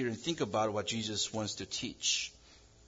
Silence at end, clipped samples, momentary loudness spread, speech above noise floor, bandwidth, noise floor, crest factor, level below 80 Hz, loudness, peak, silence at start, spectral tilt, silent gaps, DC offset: 0.3 s; under 0.1%; 6 LU; 24 dB; 7.8 kHz; -60 dBFS; 16 dB; -66 dBFS; -34 LUFS; -20 dBFS; 0 s; -3 dB/octave; none; under 0.1%